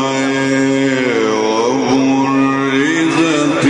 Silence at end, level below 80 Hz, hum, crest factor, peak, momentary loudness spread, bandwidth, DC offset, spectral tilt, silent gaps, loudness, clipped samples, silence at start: 0 s; -54 dBFS; none; 10 dB; -4 dBFS; 1 LU; 10 kHz; under 0.1%; -5 dB/octave; none; -14 LUFS; under 0.1%; 0 s